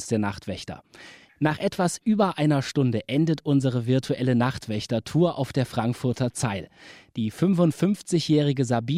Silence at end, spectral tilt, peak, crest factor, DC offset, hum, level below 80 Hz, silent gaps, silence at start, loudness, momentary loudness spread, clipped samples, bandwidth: 0 s; -6.5 dB/octave; -8 dBFS; 16 dB; under 0.1%; none; -58 dBFS; none; 0 s; -25 LUFS; 9 LU; under 0.1%; 15 kHz